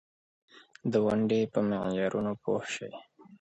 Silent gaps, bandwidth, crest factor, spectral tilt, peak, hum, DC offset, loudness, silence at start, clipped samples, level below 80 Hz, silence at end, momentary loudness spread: none; 8.2 kHz; 18 dB; -6.5 dB/octave; -14 dBFS; none; under 0.1%; -30 LUFS; 0.85 s; under 0.1%; -64 dBFS; 0.05 s; 11 LU